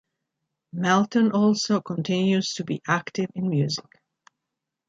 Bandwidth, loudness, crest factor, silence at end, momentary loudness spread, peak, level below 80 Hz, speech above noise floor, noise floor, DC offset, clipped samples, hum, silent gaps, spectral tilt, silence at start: 7.8 kHz; -24 LUFS; 18 dB; 1.1 s; 9 LU; -8 dBFS; -68 dBFS; 61 dB; -84 dBFS; under 0.1%; under 0.1%; none; none; -5.5 dB/octave; 0.75 s